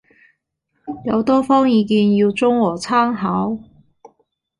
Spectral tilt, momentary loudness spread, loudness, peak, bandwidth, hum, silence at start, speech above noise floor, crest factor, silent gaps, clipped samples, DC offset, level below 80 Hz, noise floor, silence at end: -6.5 dB/octave; 13 LU; -17 LUFS; -4 dBFS; 11 kHz; none; 0.85 s; 55 dB; 14 dB; none; under 0.1%; under 0.1%; -56 dBFS; -71 dBFS; 1 s